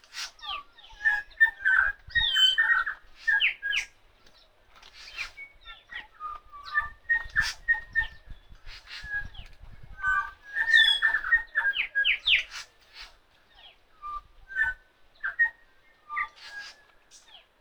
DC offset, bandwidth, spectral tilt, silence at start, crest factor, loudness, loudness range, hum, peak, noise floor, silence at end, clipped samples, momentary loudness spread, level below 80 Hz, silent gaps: under 0.1%; over 20 kHz; 1 dB/octave; 0.15 s; 22 dB; -25 LUFS; 9 LU; none; -8 dBFS; -59 dBFS; 0.45 s; under 0.1%; 22 LU; -52 dBFS; none